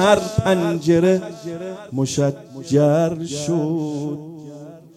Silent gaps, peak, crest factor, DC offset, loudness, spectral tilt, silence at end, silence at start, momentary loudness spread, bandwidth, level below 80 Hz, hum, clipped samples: none; -2 dBFS; 18 dB; under 0.1%; -20 LUFS; -6 dB/octave; 0.15 s; 0 s; 17 LU; 14 kHz; -50 dBFS; none; under 0.1%